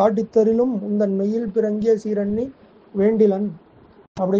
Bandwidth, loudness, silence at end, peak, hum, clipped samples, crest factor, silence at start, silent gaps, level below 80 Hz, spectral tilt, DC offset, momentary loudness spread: 7.2 kHz; -20 LUFS; 0 s; -4 dBFS; none; under 0.1%; 16 dB; 0 s; 4.08-4.15 s; -56 dBFS; -8.5 dB/octave; under 0.1%; 11 LU